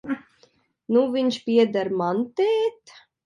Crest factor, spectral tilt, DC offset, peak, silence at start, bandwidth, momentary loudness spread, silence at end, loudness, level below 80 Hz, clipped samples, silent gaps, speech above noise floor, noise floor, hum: 16 dB; -6 dB/octave; under 0.1%; -8 dBFS; 0.05 s; 10.5 kHz; 7 LU; 0.55 s; -23 LUFS; -72 dBFS; under 0.1%; none; 40 dB; -61 dBFS; none